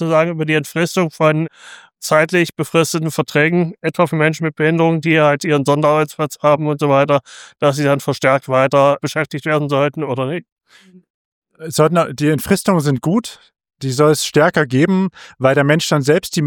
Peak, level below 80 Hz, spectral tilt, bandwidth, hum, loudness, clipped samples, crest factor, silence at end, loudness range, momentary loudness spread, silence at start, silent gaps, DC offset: 0 dBFS; -56 dBFS; -5.5 dB/octave; 19 kHz; none; -16 LUFS; under 0.1%; 14 dB; 0 s; 3 LU; 7 LU; 0 s; 10.52-10.56 s, 11.10-11.42 s; under 0.1%